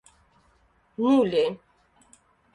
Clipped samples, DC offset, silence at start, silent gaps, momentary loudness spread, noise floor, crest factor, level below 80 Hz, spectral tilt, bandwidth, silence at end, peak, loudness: under 0.1%; under 0.1%; 1 s; none; 23 LU; -64 dBFS; 18 dB; -66 dBFS; -6.5 dB/octave; 10.5 kHz; 1 s; -10 dBFS; -23 LUFS